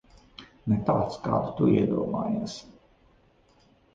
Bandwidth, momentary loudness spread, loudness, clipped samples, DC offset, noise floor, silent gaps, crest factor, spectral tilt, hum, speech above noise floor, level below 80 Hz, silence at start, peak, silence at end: 7.8 kHz; 17 LU; -27 LUFS; under 0.1%; under 0.1%; -62 dBFS; none; 18 dB; -8 dB/octave; none; 36 dB; -54 dBFS; 0.4 s; -10 dBFS; 1.25 s